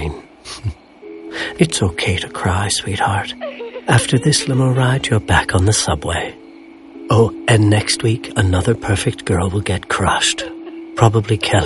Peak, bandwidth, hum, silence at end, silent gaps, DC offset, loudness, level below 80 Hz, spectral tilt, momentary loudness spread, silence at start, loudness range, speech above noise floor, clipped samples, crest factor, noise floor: 0 dBFS; 11.5 kHz; none; 0 s; none; under 0.1%; -16 LUFS; -36 dBFS; -4.5 dB/octave; 14 LU; 0 s; 3 LU; 23 dB; under 0.1%; 16 dB; -39 dBFS